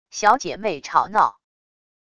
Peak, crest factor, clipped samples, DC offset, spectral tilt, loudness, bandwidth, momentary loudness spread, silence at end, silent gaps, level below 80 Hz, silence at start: -2 dBFS; 20 dB; under 0.1%; under 0.1%; -3 dB/octave; -20 LUFS; 11 kHz; 7 LU; 0.8 s; none; -58 dBFS; 0.15 s